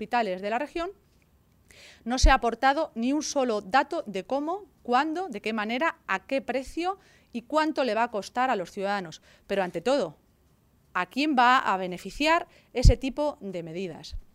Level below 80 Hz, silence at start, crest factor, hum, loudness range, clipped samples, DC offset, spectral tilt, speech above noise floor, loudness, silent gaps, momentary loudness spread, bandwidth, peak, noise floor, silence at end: -34 dBFS; 0 s; 24 dB; none; 4 LU; under 0.1%; under 0.1%; -5 dB/octave; 37 dB; -27 LUFS; none; 13 LU; 14 kHz; -4 dBFS; -63 dBFS; 0.1 s